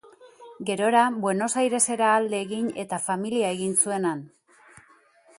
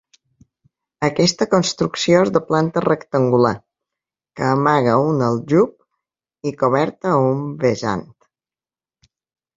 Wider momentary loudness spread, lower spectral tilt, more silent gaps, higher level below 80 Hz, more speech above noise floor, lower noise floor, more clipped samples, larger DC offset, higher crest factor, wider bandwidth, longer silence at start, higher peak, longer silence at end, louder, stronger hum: about the same, 9 LU vs 8 LU; second, -3.5 dB/octave vs -5.5 dB/octave; neither; second, -74 dBFS vs -56 dBFS; second, 33 dB vs over 73 dB; second, -57 dBFS vs under -90 dBFS; neither; neither; about the same, 22 dB vs 18 dB; first, 12 kHz vs 7.8 kHz; second, 0.05 s vs 1 s; second, -4 dBFS vs 0 dBFS; second, 1.15 s vs 1.5 s; second, -24 LUFS vs -18 LUFS; neither